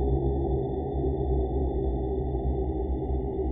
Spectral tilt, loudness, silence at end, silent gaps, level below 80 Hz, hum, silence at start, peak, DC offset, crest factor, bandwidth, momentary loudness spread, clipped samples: -13.5 dB/octave; -29 LUFS; 0 s; none; -30 dBFS; none; 0 s; -16 dBFS; under 0.1%; 12 dB; 3.7 kHz; 3 LU; under 0.1%